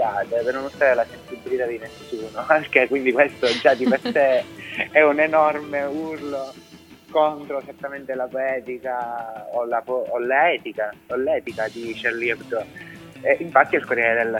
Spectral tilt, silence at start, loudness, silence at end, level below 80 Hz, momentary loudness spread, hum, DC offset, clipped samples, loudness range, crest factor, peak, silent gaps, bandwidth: -5 dB/octave; 0 s; -21 LUFS; 0 s; -62 dBFS; 13 LU; none; under 0.1%; under 0.1%; 7 LU; 22 dB; 0 dBFS; none; 16 kHz